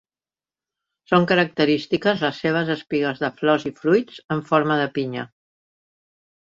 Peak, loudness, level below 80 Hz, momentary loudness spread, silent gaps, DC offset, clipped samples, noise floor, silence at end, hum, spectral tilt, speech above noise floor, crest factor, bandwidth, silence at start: -2 dBFS; -21 LUFS; -64 dBFS; 9 LU; 4.24-4.29 s; under 0.1%; under 0.1%; under -90 dBFS; 1.3 s; none; -7 dB/octave; over 69 dB; 20 dB; 7.6 kHz; 1.1 s